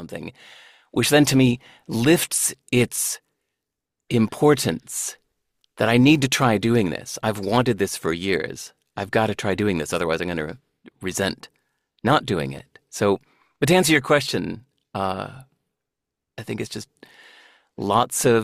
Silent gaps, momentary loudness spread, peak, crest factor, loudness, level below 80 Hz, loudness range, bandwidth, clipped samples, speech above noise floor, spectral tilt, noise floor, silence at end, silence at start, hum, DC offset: none; 16 LU; -4 dBFS; 18 dB; -21 LUFS; -54 dBFS; 5 LU; 16 kHz; under 0.1%; 63 dB; -4.5 dB/octave; -84 dBFS; 0 s; 0 s; none; under 0.1%